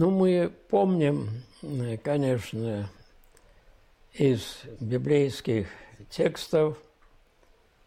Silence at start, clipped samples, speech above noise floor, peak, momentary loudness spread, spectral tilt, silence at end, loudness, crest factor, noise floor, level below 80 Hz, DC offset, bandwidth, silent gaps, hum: 0 s; under 0.1%; 35 dB; -14 dBFS; 15 LU; -7 dB/octave; 1.05 s; -27 LUFS; 14 dB; -61 dBFS; -58 dBFS; under 0.1%; 15.5 kHz; none; none